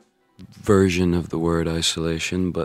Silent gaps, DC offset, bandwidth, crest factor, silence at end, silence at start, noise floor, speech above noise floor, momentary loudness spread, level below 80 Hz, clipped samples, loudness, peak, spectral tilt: none; under 0.1%; 15 kHz; 18 dB; 0 s; 0.4 s; -48 dBFS; 27 dB; 6 LU; -42 dBFS; under 0.1%; -21 LUFS; -4 dBFS; -5 dB/octave